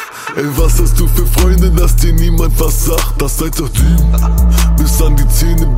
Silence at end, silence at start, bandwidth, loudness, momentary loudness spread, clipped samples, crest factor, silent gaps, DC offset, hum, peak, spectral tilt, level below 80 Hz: 0 s; 0 s; 16.5 kHz; -13 LUFS; 5 LU; under 0.1%; 10 dB; none; under 0.1%; none; 0 dBFS; -5 dB/octave; -10 dBFS